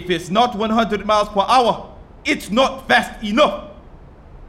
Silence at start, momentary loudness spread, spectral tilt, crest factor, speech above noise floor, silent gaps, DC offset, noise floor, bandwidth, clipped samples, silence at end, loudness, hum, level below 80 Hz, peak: 0 s; 7 LU; -4.5 dB/octave; 16 dB; 24 dB; none; under 0.1%; -41 dBFS; 16 kHz; under 0.1%; 0 s; -18 LUFS; none; -42 dBFS; -4 dBFS